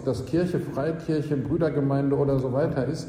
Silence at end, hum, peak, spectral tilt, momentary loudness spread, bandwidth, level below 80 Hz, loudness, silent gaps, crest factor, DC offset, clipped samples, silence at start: 0 s; none; -12 dBFS; -8.5 dB/octave; 4 LU; 10.5 kHz; -50 dBFS; -25 LUFS; none; 14 dB; under 0.1%; under 0.1%; 0 s